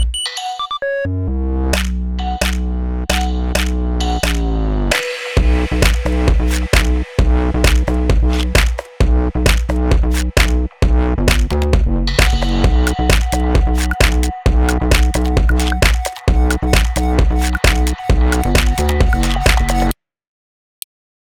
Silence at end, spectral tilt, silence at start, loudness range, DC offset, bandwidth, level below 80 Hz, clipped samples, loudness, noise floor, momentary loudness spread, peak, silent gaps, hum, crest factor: 1.4 s; -5 dB/octave; 0 s; 3 LU; under 0.1%; 17 kHz; -16 dBFS; under 0.1%; -16 LUFS; under -90 dBFS; 5 LU; 0 dBFS; none; none; 14 dB